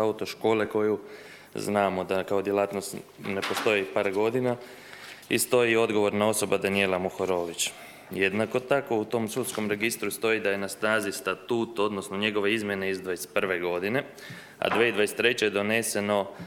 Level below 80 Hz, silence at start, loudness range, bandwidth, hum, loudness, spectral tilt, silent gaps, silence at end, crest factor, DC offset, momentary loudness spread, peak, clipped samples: -68 dBFS; 0 s; 3 LU; 19.5 kHz; none; -27 LUFS; -4 dB/octave; none; 0 s; 20 dB; under 0.1%; 10 LU; -8 dBFS; under 0.1%